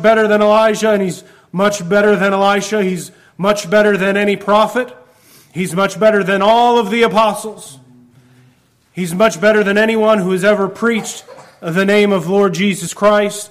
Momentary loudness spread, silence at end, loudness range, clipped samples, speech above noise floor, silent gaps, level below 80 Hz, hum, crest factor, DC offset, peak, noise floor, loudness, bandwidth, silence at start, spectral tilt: 14 LU; 0.05 s; 2 LU; under 0.1%; 40 dB; none; -54 dBFS; none; 12 dB; under 0.1%; -2 dBFS; -53 dBFS; -13 LUFS; 15.5 kHz; 0 s; -5 dB/octave